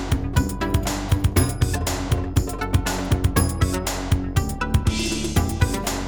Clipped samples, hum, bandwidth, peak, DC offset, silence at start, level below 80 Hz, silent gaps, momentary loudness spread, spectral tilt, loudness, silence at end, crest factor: under 0.1%; none; over 20 kHz; -4 dBFS; 0.5%; 0 s; -28 dBFS; none; 3 LU; -5 dB/octave; -23 LUFS; 0 s; 18 dB